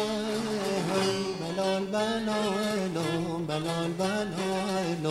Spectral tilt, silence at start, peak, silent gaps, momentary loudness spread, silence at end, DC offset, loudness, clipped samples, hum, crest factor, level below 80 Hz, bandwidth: -5 dB/octave; 0 s; -14 dBFS; none; 3 LU; 0 s; under 0.1%; -29 LUFS; under 0.1%; none; 14 dB; -58 dBFS; 15.5 kHz